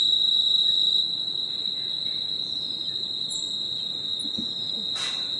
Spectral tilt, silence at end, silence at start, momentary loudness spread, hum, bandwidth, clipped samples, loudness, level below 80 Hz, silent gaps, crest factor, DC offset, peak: -1 dB/octave; 0 s; 0 s; 9 LU; none; 11.5 kHz; under 0.1%; -23 LUFS; -68 dBFS; none; 14 dB; under 0.1%; -12 dBFS